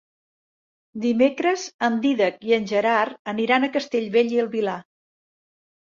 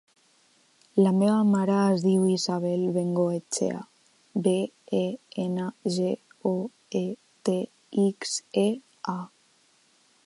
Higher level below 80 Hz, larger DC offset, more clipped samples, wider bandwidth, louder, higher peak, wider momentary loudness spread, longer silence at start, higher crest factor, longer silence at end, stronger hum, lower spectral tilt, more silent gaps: about the same, -70 dBFS vs -74 dBFS; neither; neither; second, 7.4 kHz vs 11.5 kHz; first, -22 LUFS vs -27 LUFS; first, -6 dBFS vs -10 dBFS; second, 7 LU vs 11 LU; about the same, 0.95 s vs 0.95 s; about the same, 18 dB vs 16 dB; about the same, 1 s vs 1 s; neither; second, -4.5 dB/octave vs -6 dB/octave; first, 1.74-1.79 s, 3.19-3.25 s vs none